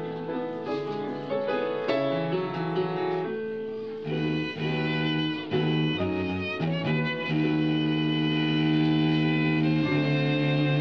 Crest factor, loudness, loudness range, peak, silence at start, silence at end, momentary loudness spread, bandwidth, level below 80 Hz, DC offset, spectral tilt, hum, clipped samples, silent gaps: 14 dB; -27 LUFS; 5 LU; -12 dBFS; 0 s; 0 s; 8 LU; 6.4 kHz; -60 dBFS; 0.1%; -8 dB/octave; none; under 0.1%; none